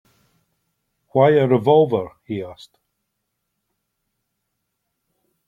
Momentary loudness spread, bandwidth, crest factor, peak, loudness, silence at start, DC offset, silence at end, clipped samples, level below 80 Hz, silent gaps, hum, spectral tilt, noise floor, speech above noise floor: 15 LU; 7.2 kHz; 20 dB; -2 dBFS; -18 LUFS; 1.15 s; under 0.1%; 2.95 s; under 0.1%; -64 dBFS; none; none; -8.5 dB/octave; -76 dBFS; 59 dB